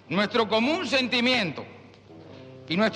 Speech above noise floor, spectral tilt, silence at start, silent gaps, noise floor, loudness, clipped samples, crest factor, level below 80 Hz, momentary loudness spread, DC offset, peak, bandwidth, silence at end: 24 dB; -4.5 dB/octave; 0.1 s; none; -48 dBFS; -24 LUFS; under 0.1%; 16 dB; -66 dBFS; 23 LU; under 0.1%; -10 dBFS; 11 kHz; 0 s